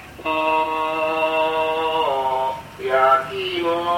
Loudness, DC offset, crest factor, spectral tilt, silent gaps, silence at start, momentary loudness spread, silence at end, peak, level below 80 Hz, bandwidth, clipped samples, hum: -20 LUFS; under 0.1%; 16 dB; -4.5 dB/octave; none; 0 s; 7 LU; 0 s; -4 dBFS; -54 dBFS; 16.5 kHz; under 0.1%; none